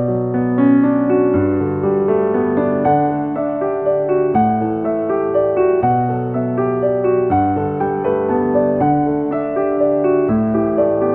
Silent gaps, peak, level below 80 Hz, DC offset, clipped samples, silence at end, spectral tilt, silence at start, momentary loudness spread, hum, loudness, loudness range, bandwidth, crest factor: none; -4 dBFS; -46 dBFS; under 0.1%; under 0.1%; 0 s; -12.5 dB/octave; 0 s; 4 LU; none; -16 LUFS; 1 LU; 3.6 kHz; 12 dB